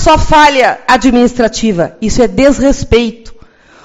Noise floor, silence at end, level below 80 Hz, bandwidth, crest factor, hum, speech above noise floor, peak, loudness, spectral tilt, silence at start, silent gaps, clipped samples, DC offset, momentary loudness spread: -39 dBFS; 0.5 s; -24 dBFS; 11.5 kHz; 10 dB; none; 30 dB; 0 dBFS; -9 LUFS; -4.5 dB/octave; 0 s; none; 2%; under 0.1%; 7 LU